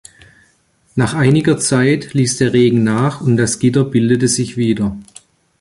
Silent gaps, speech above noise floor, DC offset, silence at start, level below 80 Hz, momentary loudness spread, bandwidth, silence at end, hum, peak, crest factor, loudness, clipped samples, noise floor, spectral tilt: none; 43 dB; under 0.1%; 0.95 s; -46 dBFS; 6 LU; 11.5 kHz; 0.6 s; none; -2 dBFS; 14 dB; -14 LUFS; under 0.1%; -56 dBFS; -5.5 dB/octave